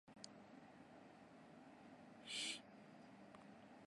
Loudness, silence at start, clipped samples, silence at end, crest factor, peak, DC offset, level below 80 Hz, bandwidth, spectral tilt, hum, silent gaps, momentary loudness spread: -55 LUFS; 0.05 s; under 0.1%; 0 s; 22 dB; -34 dBFS; under 0.1%; -90 dBFS; 11.5 kHz; -1.5 dB/octave; none; none; 17 LU